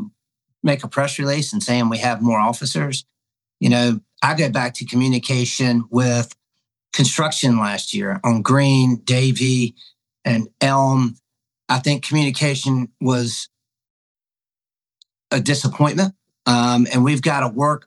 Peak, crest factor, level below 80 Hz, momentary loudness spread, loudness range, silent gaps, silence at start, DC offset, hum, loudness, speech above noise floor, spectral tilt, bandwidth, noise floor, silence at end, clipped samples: 0 dBFS; 18 dB; -70 dBFS; 7 LU; 5 LU; 13.90-14.15 s; 0 s; under 0.1%; none; -19 LUFS; over 72 dB; -5 dB/octave; 12 kHz; under -90 dBFS; 0.05 s; under 0.1%